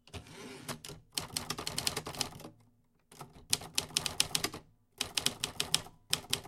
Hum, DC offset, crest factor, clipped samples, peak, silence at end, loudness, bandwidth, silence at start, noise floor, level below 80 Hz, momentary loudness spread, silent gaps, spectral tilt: none; under 0.1%; 32 dB; under 0.1%; -6 dBFS; 0 s; -35 LUFS; 17 kHz; 0.05 s; -68 dBFS; -60 dBFS; 19 LU; none; -1 dB/octave